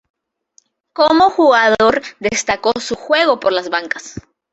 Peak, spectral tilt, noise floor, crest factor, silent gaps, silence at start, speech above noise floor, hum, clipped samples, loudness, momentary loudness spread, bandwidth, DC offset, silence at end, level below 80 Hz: 0 dBFS; -3 dB/octave; -56 dBFS; 14 dB; none; 1 s; 42 dB; none; under 0.1%; -14 LUFS; 13 LU; 8.2 kHz; under 0.1%; 0.3 s; -52 dBFS